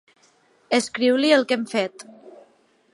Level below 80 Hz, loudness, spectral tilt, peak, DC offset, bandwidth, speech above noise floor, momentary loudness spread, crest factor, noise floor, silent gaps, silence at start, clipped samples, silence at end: -78 dBFS; -21 LUFS; -3 dB/octave; -6 dBFS; under 0.1%; 11.5 kHz; 39 dB; 11 LU; 18 dB; -60 dBFS; none; 0.7 s; under 0.1%; 0.65 s